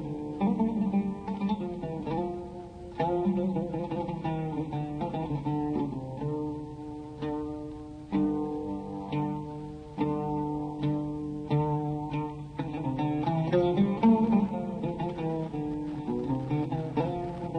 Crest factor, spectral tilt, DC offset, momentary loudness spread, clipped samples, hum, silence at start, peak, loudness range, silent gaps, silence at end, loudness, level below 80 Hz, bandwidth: 18 dB; -9.5 dB/octave; under 0.1%; 11 LU; under 0.1%; none; 0 s; -12 dBFS; 6 LU; none; 0 s; -31 LUFS; -52 dBFS; 9.4 kHz